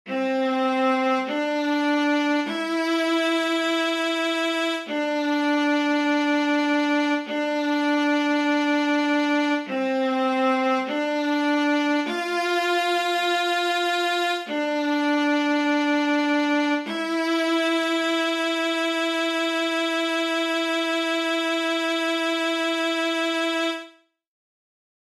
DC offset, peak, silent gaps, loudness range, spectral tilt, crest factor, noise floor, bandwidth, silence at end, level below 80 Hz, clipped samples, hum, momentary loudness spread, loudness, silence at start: under 0.1%; -12 dBFS; none; 1 LU; -2 dB/octave; 12 dB; -49 dBFS; 14 kHz; 1.25 s; -78 dBFS; under 0.1%; none; 3 LU; -23 LUFS; 0.05 s